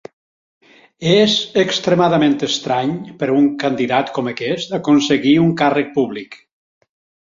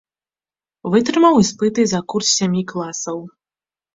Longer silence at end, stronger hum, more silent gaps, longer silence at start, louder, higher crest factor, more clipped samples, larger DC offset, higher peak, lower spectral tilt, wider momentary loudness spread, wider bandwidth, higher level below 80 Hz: first, 0.9 s vs 0.65 s; neither; neither; first, 1 s vs 0.85 s; about the same, -16 LUFS vs -17 LUFS; about the same, 16 dB vs 16 dB; neither; neither; about the same, -2 dBFS vs -2 dBFS; about the same, -5 dB/octave vs -4.5 dB/octave; second, 9 LU vs 13 LU; about the same, 7.6 kHz vs 7.8 kHz; about the same, -58 dBFS vs -56 dBFS